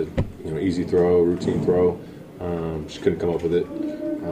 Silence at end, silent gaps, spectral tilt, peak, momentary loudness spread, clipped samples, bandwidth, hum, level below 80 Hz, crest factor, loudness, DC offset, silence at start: 0 s; none; -8 dB/octave; -6 dBFS; 11 LU; under 0.1%; 10 kHz; none; -46 dBFS; 16 dB; -23 LUFS; under 0.1%; 0 s